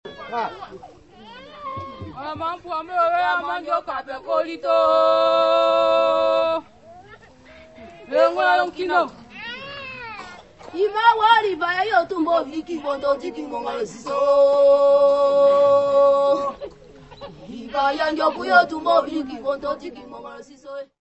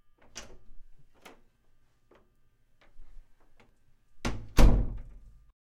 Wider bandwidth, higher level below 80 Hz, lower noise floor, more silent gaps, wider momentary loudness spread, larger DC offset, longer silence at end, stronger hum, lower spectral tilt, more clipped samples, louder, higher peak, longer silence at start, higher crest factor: second, 8.4 kHz vs 14.5 kHz; second, -58 dBFS vs -32 dBFS; second, -47 dBFS vs -64 dBFS; neither; second, 20 LU vs 30 LU; neither; second, 0.15 s vs 0.75 s; neither; second, -4.5 dB/octave vs -6 dB/octave; neither; first, -19 LUFS vs -29 LUFS; first, -2 dBFS vs -6 dBFS; second, 0.05 s vs 0.35 s; second, 18 dB vs 24 dB